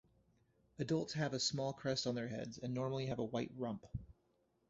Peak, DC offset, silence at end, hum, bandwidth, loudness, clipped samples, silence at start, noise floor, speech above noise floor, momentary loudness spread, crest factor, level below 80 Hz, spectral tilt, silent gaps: -24 dBFS; under 0.1%; 0.6 s; none; 8 kHz; -41 LUFS; under 0.1%; 0.8 s; -79 dBFS; 38 dB; 9 LU; 18 dB; -66 dBFS; -5 dB/octave; none